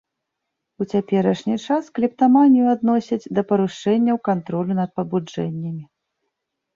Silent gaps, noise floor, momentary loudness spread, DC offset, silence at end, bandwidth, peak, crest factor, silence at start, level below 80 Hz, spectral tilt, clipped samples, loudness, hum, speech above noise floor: none; -80 dBFS; 12 LU; under 0.1%; 0.9 s; 7.4 kHz; -4 dBFS; 16 dB; 0.8 s; -64 dBFS; -8 dB/octave; under 0.1%; -20 LUFS; none; 61 dB